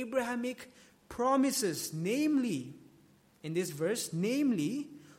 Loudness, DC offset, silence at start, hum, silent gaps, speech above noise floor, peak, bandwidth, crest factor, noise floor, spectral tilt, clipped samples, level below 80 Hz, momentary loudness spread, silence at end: -33 LUFS; under 0.1%; 0 s; none; none; 31 dB; -18 dBFS; 16.5 kHz; 16 dB; -63 dBFS; -4.5 dB/octave; under 0.1%; -72 dBFS; 17 LU; 0.05 s